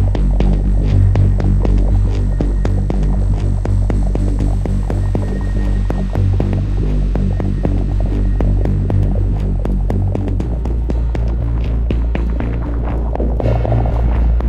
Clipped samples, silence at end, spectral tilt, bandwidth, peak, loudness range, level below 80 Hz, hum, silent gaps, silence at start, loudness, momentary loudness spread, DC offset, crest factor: under 0.1%; 0 s; -9 dB/octave; 5.2 kHz; -2 dBFS; 3 LU; -16 dBFS; none; none; 0 s; -17 LUFS; 4 LU; under 0.1%; 12 dB